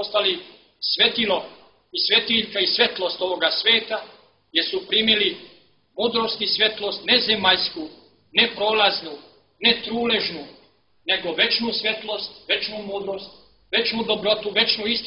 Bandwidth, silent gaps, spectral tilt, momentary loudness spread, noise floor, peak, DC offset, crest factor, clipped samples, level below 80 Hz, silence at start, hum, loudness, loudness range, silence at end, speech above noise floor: 6 kHz; none; -5.5 dB/octave; 12 LU; -58 dBFS; -4 dBFS; under 0.1%; 20 dB; under 0.1%; -60 dBFS; 0 s; none; -20 LUFS; 3 LU; 0 s; 35 dB